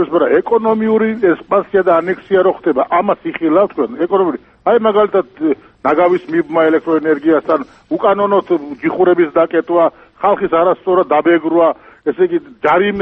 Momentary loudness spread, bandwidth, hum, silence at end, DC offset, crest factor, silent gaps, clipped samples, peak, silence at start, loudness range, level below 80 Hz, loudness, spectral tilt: 6 LU; 4.3 kHz; none; 0 s; under 0.1%; 14 dB; none; under 0.1%; 0 dBFS; 0 s; 1 LU; -54 dBFS; -14 LUFS; -8.5 dB/octave